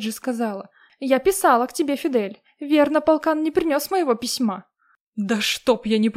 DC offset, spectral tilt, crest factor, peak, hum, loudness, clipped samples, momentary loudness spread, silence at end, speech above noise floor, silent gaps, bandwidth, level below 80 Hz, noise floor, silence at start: under 0.1%; -4 dB/octave; 18 dB; -4 dBFS; none; -21 LUFS; under 0.1%; 13 LU; 0.05 s; 33 dB; 5.01-5.12 s; 16 kHz; -58 dBFS; -53 dBFS; 0 s